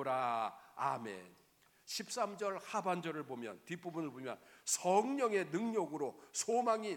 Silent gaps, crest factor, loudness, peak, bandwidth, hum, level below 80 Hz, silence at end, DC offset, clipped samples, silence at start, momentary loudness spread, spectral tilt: none; 20 dB; -38 LUFS; -18 dBFS; 19 kHz; none; -88 dBFS; 0 s; under 0.1%; under 0.1%; 0 s; 13 LU; -3.5 dB/octave